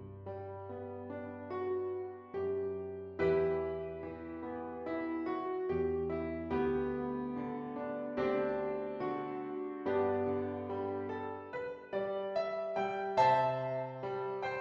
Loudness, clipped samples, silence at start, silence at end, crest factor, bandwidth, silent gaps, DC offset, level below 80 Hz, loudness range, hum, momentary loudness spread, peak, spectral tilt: -37 LUFS; under 0.1%; 0 s; 0 s; 20 dB; 6.8 kHz; none; under 0.1%; -62 dBFS; 3 LU; none; 11 LU; -16 dBFS; -8 dB/octave